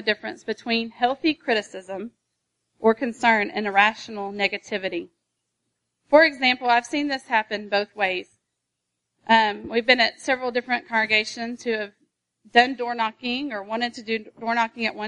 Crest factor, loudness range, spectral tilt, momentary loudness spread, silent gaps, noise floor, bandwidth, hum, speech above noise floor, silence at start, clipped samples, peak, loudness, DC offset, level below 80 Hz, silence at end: 22 dB; 3 LU; -3.5 dB/octave; 12 LU; none; -80 dBFS; 11 kHz; none; 57 dB; 0 s; under 0.1%; -2 dBFS; -22 LUFS; under 0.1%; -68 dBFS; 0 s